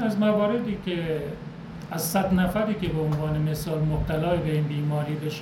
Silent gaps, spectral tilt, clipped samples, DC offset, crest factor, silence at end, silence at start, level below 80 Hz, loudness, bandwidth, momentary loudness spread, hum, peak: none; -6.5 dB/octave; under 0.1%; under 0.1%; 14 dB; 0 s; 0 s; -42 dBFS; -26 LUFS; 17 kHz; 8 LU; none; -12 dBFS